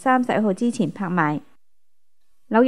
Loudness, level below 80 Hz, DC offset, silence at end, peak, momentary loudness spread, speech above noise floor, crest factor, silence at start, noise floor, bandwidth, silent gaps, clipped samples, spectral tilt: -22 LUFS; -72 dBFS; 0.4%; 0 s; -4 dBFS; 6 LU; 59 dB; 18 dB; 0 s; -80 dBFS; 11 kHz; none; under 0.1%; -7 dB/octave